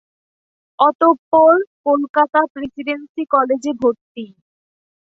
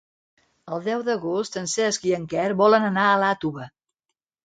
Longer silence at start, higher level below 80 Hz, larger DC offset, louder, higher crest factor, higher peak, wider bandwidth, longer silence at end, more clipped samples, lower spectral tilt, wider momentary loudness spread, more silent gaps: first, 0.8 s vs 0.65 s; about the same, -62 dBFS vs -66 dBFS; neither; first, -16 LUFS vs -22 LUFS; about the same, 16 dB vs 20 dB; about the same, -2 dBFS vs -4 dBFS; second, 7.8 kHz vs 9.4 kHz; first, 0.9 s vs 0.75 s; neither; about the same, -5 dB/octave vs -4 dB/octave; about the same, 15 LU vs 13 LU; first, 0.95-0.99 s, 1.19-1.32 s, 1.67-1.84 s, 2.09-2.14 s, 2.50-2.55 s, 3.09-3.15 s, 4.01-4.15 s vs none